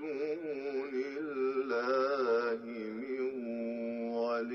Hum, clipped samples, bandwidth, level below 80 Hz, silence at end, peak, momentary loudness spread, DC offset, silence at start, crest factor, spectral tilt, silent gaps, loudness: none; under 0.1%; 6.6 kHz; -82 dBFS; 0 s; -22 dBFS; 7 LU; under 0.1%; 0 s; 14 dB; -6 dB/octave; none; -35 LUFS